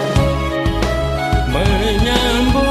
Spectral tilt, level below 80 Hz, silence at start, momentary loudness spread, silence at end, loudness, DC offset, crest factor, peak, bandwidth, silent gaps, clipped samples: -5.5 dB/octave; -20 dBFS; 0 s; 4 LU; 0 s; -16 LUFS; under 0.1%; 16 dB; 0 dBFS; 14 kHz; none; under 0.1%